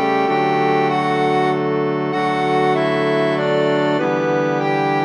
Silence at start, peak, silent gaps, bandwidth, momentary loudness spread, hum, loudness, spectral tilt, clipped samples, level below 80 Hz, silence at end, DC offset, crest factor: 0 s; -4 dBFS; none; 10 kHz; 2 LU; none; -17 LUFS; -6.5 dB/octave; under 0.1%; -62 dBFS; 0 s; under 0.1%; 12 dB